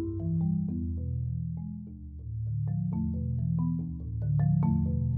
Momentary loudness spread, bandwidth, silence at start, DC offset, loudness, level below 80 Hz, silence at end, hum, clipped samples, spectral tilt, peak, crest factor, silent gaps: 12 LU; 2.4 kHz; 0 s; under 0.1%; -31 LUFS; -42 dBFS; 0 s; none; under 0.1%; -15 dB/octave; -16 dBFS; 14 dB; none